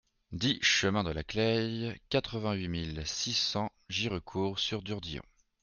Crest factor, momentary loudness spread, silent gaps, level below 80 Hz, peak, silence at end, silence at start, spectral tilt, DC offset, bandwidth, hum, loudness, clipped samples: 20 dB; 11 LU; none; -54 dBFS; -14 dBFS; 0.4 s; 0.3 s; -4 dB/octave; under 0.1%; 10 kHz; none; -32 LUFS; under 0.1%